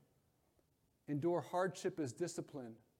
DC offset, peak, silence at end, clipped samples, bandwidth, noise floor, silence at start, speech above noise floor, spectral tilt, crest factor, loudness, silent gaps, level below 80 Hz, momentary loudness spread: under 0.1%; -24 dBFS; 0.25 s; under 0.1%; 15.5 kHz; -78 dBFS; 1.1 s; 37 dB; -6 dB/octave; 18 dB; -41 LUFS; none; -84 dBFS; 13 LU